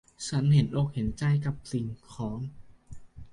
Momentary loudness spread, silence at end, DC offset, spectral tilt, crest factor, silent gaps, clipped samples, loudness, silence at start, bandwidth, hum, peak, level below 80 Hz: 14 LU; 0 s; under 0.1%; -7 dB/octave; 18 dB; none; under 0.1%; -29 LUFS; 0.2 s; 11 kHz; none; -12 dBFS; -50 dBFS